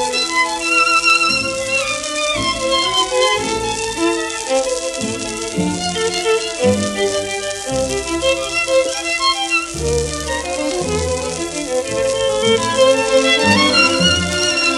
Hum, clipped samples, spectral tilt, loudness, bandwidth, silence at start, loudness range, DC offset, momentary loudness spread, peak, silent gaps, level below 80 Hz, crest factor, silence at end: none; under 0.1%; -2.5 dB/octave; -16 LUFS; 13 kHz; 0 s; 4 LU; under 0.1%; 9 LU; 0 dBFS; none; -38 dBFS; 16 dB; 0 s